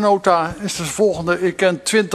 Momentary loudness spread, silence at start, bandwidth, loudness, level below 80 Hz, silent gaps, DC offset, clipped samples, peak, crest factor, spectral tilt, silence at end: 7 LU; 0 s; 13.5 kHz; -18 LUFS; -48 dBFS; none; under 0.1%; under 0.1%; 0 dBFS; 18 dB; -4 dB/octave; 0 s